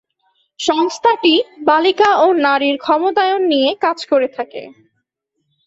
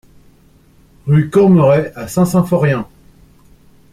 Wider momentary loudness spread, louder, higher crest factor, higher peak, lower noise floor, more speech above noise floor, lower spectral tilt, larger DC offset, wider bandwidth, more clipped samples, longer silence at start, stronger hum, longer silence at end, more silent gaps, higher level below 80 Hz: second, 9 LU vs 12 LU; about the same, -14 LUFS vs -13 LUFS; about the same, 14 dB vs 14 dB; about the same, -2 dBFS vs -2 dBFS; first, -72 dBFS vs -48 dBFS; first, 57 dB vs 36 dB; second, -2.5 dB/octave vs -8 dB/octave; neither; second, 8 kHz vs 15.5 kHz; neither; second, 0.6 s vs 1.05 s; neither; second, 0.95 s vs 1.1 s; neither; second, -64 dBFS vs -46 dBFS